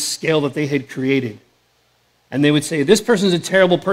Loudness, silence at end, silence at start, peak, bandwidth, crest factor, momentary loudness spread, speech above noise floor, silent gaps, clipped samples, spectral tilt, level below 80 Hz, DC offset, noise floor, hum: -17 LUFS; 0 s; 0 s; 0 dBFS; 16 kHz; 18 dB; 7 LU; 44 dB; none; under 0.1%; -4.5 dB/octave; -58 dBFS; under 0.1%; -60 dBFS; none